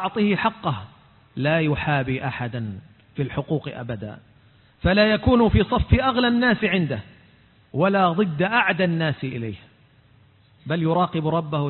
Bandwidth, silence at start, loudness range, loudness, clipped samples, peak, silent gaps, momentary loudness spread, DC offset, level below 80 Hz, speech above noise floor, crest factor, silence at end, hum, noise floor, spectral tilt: 4.3 kHz; 0 s; 6 LU; -22 LUFS; under 0.1%; -4 dBFS; none; 15 LU; under 0.1%; -38 dBFS; 34 dB; 18 dB; 0 s; none; -55 dBFS; -11.5 dB/octave